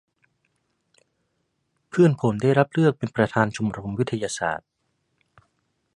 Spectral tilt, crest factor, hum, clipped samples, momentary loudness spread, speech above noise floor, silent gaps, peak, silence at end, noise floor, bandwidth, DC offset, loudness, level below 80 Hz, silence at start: -6.5 dB/octave; 24 dB; none; under 0.1%; 9 LU; 52 dB; none; -2 dBFS; 1.4 s; -74 dBFS; 11.5 kHz; under 0.1%; -23 LUFS; -58 dBFS; 1.95 s